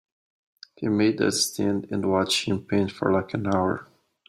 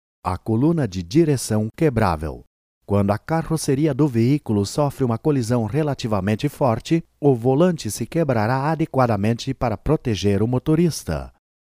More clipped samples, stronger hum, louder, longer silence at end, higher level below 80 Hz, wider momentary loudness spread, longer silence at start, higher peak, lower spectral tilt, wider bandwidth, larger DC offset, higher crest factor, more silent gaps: neither; neither; second, -24 LUFS vs -21 LUFS; about the same, 0.45 s vs 0.35 s; second, -64 dBFS vs -42 dBFS; about the same, 5 LU vs 6 LU; first, 0.8 s vs 0.25 s; second, -8 dBFS vs -4 dBFS; second, -4.5 dB/octave vs -7 dB/octave; about the same, 15.5 kHz vs 15.5 kHz; neither; about the same, 18 dB vs 16 dB; second, none vs 2.47-2.81 s